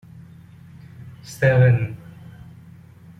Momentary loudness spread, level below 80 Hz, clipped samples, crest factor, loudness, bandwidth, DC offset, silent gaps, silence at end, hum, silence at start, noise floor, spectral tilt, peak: 27 LU; -52 dBFS; under 0.1%; 18 dB; -18 LUFS; 10.5 kHz; under 0.1%; none; 1.25 s; none; 1 s; -45 dBFS; -7.5 dB/octave; -4 dBFS